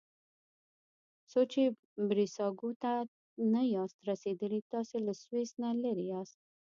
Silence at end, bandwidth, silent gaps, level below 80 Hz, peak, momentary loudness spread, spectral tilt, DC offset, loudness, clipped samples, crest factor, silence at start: 0.45 s; 7.4 kHz; 1.79-1.96 s, 2.76-2.80 s, 3.08-3.37 s, 3.94-3.99 s, 4.62-4.70 s; -86 dBFS; -18 dBFS; 7 LU; -6.5 dB/octave; under 0.1%; -35 LUFS; under 0.1%; 16 dB; 1.35 s